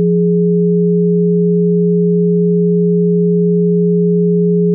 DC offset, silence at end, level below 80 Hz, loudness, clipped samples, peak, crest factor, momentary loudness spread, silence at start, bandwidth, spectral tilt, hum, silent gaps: under 0.1%; 0 s; -82 dBFS; -12 LUFS; under 0.1%; -6 dBFS; 6 dB; 0 LU; 0 s; 0.5 kHz; -21 dB/octave; none; none